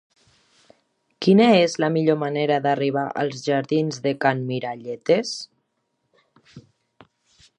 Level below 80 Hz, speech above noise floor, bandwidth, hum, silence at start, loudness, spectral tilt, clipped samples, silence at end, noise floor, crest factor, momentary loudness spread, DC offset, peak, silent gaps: -72 dBFS; 53 dB; 10 kHz; none; 1.2 s; -21 LUFS; -6 dB/octave; under 0.1%; 1 s; -74 dBFS; 20 dB; 13 LU; under 0.1%; -4 dBFS; none